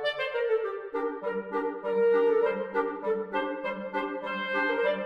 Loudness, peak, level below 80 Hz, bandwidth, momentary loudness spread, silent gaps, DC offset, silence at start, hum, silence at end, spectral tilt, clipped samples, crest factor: -29 LUFS; -16 dBFS; -68 dBFS; 5.6 kHz; 9 LU; none; under 0.1%; 0 s; none; 0 s; -6 dB/octave; under 0.1%; 14 dB